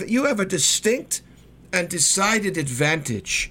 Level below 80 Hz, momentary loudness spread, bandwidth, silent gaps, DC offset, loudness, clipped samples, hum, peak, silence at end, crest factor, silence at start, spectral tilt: -50 dBFS; 8 LU; 17 kHz; none; under 0.1%; -21 LUFS; under 0.1%; none; -6 dBFS; 0 s; 18 dB; 0 s; -2.5 dB/octave